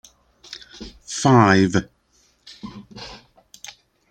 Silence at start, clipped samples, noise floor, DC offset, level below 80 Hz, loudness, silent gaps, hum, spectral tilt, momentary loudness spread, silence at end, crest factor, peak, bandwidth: 0.5 s; under 0.1%; -61 dBFS; under 0.1%; -52 dBFS; -17 LUFS; none; none; -5.5 dB/octave; 25 LU; 0.95 s; 20 dB; -2 dBFS; 10.5 kHz